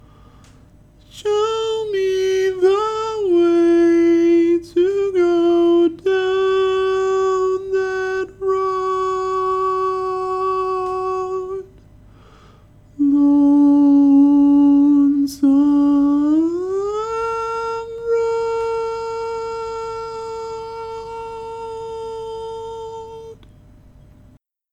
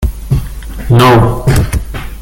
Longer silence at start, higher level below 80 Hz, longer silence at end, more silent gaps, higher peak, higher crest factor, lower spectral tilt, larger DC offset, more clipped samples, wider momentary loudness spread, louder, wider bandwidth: first, 1.15 s vs 0 s; second, -50 dBFS vs -18 dBFS; first, 1.4 s vs 0 s; neither; second, -6 dBFS vs 0 dBFS; about the same, 12 dB vs 10 dB; about the same, -5.5 dB/octave vs -6.5 dB/octave; neither; neither; about the same, 17 LU vs 18 LU; second, -17 LUFS vs -10 LUFS; second, 8.6 kHz vs 17 kHz